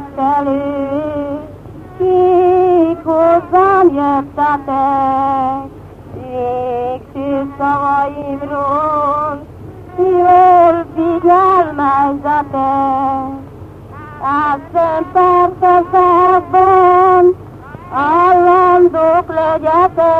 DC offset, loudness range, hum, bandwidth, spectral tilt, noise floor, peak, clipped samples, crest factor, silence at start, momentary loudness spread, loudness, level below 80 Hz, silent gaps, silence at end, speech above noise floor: under 0.1%; 7 LU; 50 Hz at -40 dBFS; 4.9 kHz; -8.5 dB/octave; -32 dBFS; 0 dBFS; under 0.1%; 12 dB; 0 s; 14 LU; -12 LUFS; -42 dBFS; none; 0 s; 21 dB